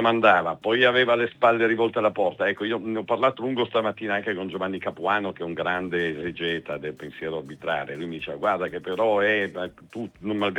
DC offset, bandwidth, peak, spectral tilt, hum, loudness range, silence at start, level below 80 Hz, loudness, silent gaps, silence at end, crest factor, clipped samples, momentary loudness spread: under 0.1%; 9.8 kHz; -4 dBFS; -6.5 dB/octave; none; 6 LU; 0 s; -66 dBFS; -24 LUFS; none; 0 s; 22 dB; under 0.1%; 13 LU